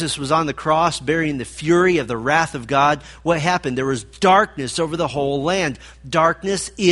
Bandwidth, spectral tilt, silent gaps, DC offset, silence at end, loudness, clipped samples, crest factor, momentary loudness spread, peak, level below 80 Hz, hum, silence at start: 11.5 kHz; -4.5 dB/octave; none; under 0.1%; 0 s; -19 LUFS; under 0.1%; 18 dB; 8 LU; -2 dBFS; -46 dBFS; none; 0 s